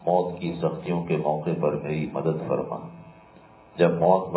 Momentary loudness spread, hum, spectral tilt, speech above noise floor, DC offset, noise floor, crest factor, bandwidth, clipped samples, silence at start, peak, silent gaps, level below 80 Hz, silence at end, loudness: 11 LU; none; -11.5 dB/octave; 26 dB; under 0.1%; -51 dBFS; 20 dB; 4 kHz; under 0.1%; 0 s; -6 dBFS; none; -58 dBFS; 0 s; -26 LUFS